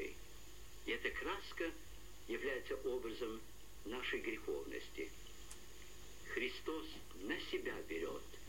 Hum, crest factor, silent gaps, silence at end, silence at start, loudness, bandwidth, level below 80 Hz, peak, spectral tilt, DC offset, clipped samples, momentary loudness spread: none; 18 dB; none; 0 s; 0 s; -45 LUFS; 16.5 kHz; -60 dBFS; -28 dBFS; -3.5 dB/octave; 0.3%; under 0.1%; 15 LU